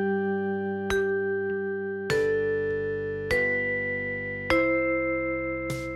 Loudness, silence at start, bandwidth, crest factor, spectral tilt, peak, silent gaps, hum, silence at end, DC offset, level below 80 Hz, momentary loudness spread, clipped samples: -27 LUFS; 0 s; 14 kHz; 22 dB; -6 dB/octave; -6 dBFS; none; none; 0 s; under 0.1%; -50 dBFS; 6 LU; under 0.1%